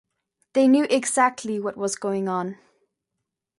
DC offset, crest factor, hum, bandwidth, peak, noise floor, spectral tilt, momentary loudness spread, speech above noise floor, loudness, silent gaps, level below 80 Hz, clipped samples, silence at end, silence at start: under 0.1%; 18 dB; none; 11.5 kHz; -6 dBFS; -82 dBFS; -4 dB/octave; 10 LU; 60 dB; -22 LUFS; none; -74 dBFS; under 0.1%; 1.05 s; 0.55 s